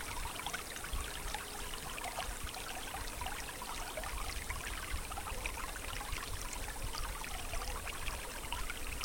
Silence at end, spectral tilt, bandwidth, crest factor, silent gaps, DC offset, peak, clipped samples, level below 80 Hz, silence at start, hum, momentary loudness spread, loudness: 0 s; -2 dB/octave; 17 kHz; 18 dB; none; under 0.1%; -22 dBFS; under 0.1%; -46 dBFS; 0 s; none; 2 LU; -41 LUFS